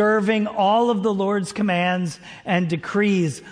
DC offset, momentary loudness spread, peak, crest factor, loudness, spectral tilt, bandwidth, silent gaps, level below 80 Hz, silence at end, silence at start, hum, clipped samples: under 0.1%; 6 LU; -8 dBFS; 14 dB; -21 LUFS; -6 dB/octave; 10.5 kHz; none; -62 dBFS; 0 s; 0 s; none; under 0.1%